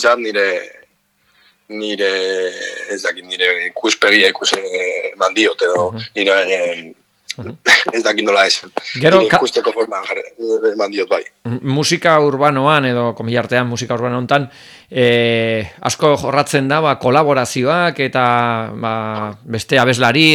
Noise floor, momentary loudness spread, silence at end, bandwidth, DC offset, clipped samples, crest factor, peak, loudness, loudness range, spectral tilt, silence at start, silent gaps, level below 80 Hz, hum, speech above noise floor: -60 dBFS; 12 LU; 0 s; 18 kHz; under 0.1%; under 0.1%; 16 dB; 0 dBFS; -15 LUFS; 3 LU; -4 dB/octave; 0 s; none; -58 dBFS; none; 44 dB